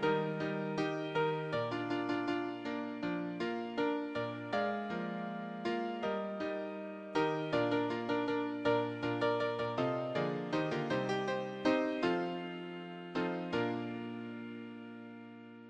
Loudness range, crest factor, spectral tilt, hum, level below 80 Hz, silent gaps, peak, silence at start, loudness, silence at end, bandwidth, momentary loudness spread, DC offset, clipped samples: 3 LU; 18 dB; -6.5 dB/octave; none; -72 dBFS; none; -18 dBFS; 0 s; -36 LUFS; 0 s; 9.2 kHz; 11 LU; under 0.1%; under 0.1%